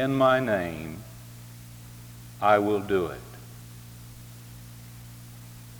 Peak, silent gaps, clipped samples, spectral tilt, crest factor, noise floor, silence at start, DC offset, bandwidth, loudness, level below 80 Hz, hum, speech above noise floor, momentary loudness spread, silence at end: -8 dBFS; none; under 0.1%; -6 dB/octave; 20 dB; -45 dBFS; 0 s; under 0.1%; over 20 kHz; -25 LUFS; -56 dBFS; none; 20 dB; 23 LU; 0 s